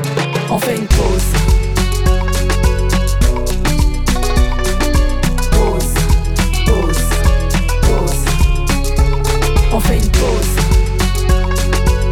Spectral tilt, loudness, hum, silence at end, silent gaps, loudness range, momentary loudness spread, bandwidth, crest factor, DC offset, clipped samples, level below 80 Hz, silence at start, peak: -5 dB/octave; -15 LUFS; none; 0 s; none; 1 LU; 2 LU; 17 kHz; 12 dB; under 0.1%; under 0.1%; -14 dBFS; 0 s; 0 dBFS